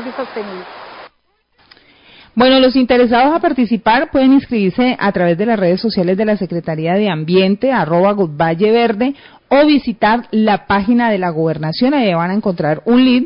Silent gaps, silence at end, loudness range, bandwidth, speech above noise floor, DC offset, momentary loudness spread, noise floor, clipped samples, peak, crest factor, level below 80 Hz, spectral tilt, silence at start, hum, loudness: none; 0 s; 2 LU; 5.4 kHz; 47 dB; under 0.1%; 9 LU; -60 dBFS; under 0.1%; -2 dBFS; 12 dB; -46 dBFS; -11.5 dB/octave; 0 s; none; -14 LUFS